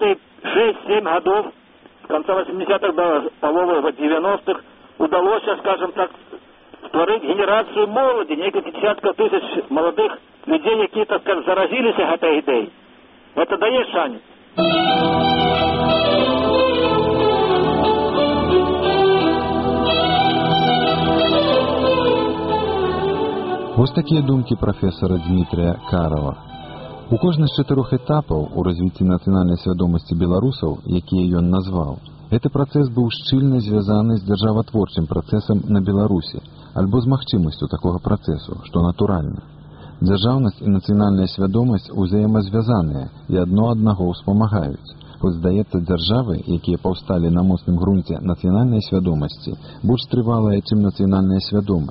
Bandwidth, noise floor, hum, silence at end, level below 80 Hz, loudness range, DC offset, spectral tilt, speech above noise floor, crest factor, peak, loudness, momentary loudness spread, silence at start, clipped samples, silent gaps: 5.8 kHz; -47 dBFS; none; 0 s; -38 dBFS; 4 LU; under 0.1%; -5.5 dB/octave; 29 dB; 18 dB; 0 dBFS; -18 LUFS; 7 LU; 0 s; under 0.1%; none